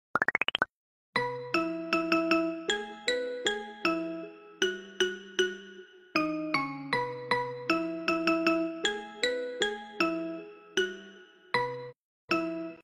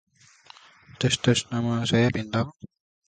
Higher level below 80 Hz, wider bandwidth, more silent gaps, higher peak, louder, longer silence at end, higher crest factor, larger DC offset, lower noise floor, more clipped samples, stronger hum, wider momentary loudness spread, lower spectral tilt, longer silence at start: second, -68 dBFS vs -54 dBFS; first, 16 kHz vs 9.4 kHz; first, 0.69-1.13 s, 11.96-12.28 s vs none; second, -10 dBFS vs -6 dBFS; second, -31 LUFS vs -25 LUFS; second, 0 s vs 0.4 s; about the same, 22 dB vs 20 dB; neither; about the same, -53 dBFS vs -53 dBFS; neither; neither; about the same, 9 LU vs 7 LU; second, -3.5 dB/octave vs -5 dB/octave; second, 0.15 s vs 1 s